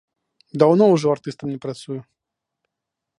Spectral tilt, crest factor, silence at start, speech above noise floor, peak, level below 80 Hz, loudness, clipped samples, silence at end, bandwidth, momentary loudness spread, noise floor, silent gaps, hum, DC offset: -7.5 dB/octave; 20 dB; 0.55 s; 65 dB; 0 dBFS; -66 dBFS; -18 LUFS; under 0.1%; 1.2 s; 11 kHz; 19 LU; -83 dBFS; none; none; under 0.1%